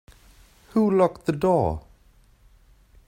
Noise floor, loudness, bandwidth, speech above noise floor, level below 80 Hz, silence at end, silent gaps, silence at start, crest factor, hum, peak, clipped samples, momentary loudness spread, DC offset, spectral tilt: -56 dBFS; -23 LUFS; 16 kHz; 35 dB; -48 dBFS; 1.25 s; none; 0.75 s; 18 dB; none; -8 dBFS; under 0.1%; 8 LU; under 0.1%; -8.5 dB/octave